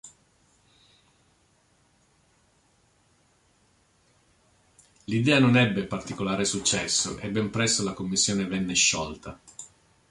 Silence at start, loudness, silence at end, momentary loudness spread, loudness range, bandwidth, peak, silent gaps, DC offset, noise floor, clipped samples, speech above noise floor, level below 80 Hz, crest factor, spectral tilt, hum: 0.05 s; -24 LUFS; 0.45 s; 22 LU; 3 LU; 11.5 kHz; -8 dBFS; none; under 0.1%; -65 dBFS; under 0.1%; 40 dB; -56 dBFS; 22 dB; -3.5 dB/octave; none